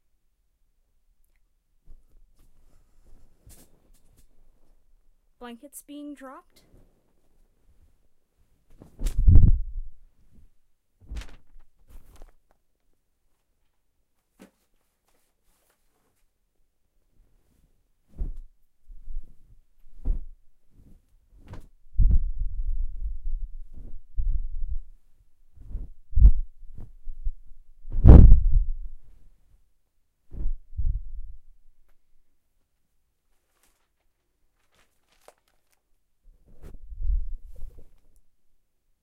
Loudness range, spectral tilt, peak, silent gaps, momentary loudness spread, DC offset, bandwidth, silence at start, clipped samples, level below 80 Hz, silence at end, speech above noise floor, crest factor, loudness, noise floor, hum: 26 LU; -9.5 dB/octave; 0 dBFS; none; 28 LU; under 0.1%; 3 kHz; 5.4 s; under 0.1%; -26 dBFS; 1.2 s; 28 dB; 24 dB; -24 LUFS; -71 dBFS; none